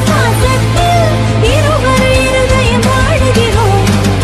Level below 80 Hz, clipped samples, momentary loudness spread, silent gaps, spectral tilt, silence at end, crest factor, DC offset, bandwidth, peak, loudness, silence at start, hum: -18 dBFS; under 0.1%; 1 LU; none; -5.5 dB/octave; 0 s; 8 dB; under 0.1%; 14.5 kHz; 0 dBFS; -10 LUFS; 0 s; none